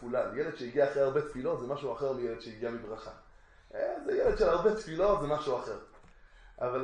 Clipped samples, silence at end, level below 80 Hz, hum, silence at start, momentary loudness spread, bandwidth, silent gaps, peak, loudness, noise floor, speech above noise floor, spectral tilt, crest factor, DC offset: under 0.1%; 0 s; -52 dBFS; none; 0 s; 14 LU; 9.8 kHz; none; -14 dBFS; -32 LUFS; -56 dBFS; 25 dB; -6.5 dB/octave; 18 dB; under 0.1%